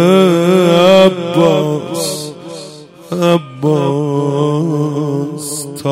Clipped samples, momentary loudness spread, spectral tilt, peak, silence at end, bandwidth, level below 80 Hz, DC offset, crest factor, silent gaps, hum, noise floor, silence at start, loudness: 0.2%; 15 LU; -6 dB/octave; 0 dBFS; 0 s; 16.5 kHz; -56 dBFS; under 0.1%; 12 dB; none; none; -33 dBFS; 0 s; -13 LUFS